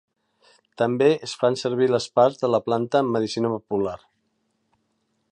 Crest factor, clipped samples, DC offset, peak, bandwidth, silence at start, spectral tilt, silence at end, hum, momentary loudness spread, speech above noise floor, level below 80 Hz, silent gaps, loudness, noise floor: 18 dB; under 0.1%; under 0.1%; -6 dBFS; 10.5 kHz; 0.8 s; -6 dB/octave; 1.35 s; none; 7 LU; 50 dB; -64 dBFS; none; -22 LUFS; -72 dBFS